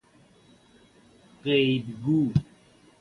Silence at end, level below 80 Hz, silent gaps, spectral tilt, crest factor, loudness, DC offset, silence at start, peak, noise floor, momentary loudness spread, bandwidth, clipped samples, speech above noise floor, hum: 0.6 s; -54 dBFS; none; -8 dB/octave; 20 dB; -26 LUFS; under 0.1%; 1.45 s; -10 dBFS; -58 dBFS; 6 LU; 11 kHz; under 0.1%; 34 dB; none